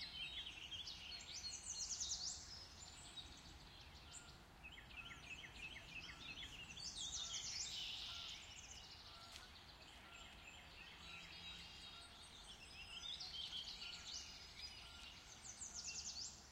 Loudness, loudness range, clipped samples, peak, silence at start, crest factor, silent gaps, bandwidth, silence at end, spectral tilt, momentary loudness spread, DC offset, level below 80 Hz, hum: -51 LUFS; 8 LU; under 0.1%; -34 dBFS; 0 s; 20 dB; none; 16 kHz; 0 s; -0.5 dB/octave; 12 LU; under 0.1%; -68 dBFS; none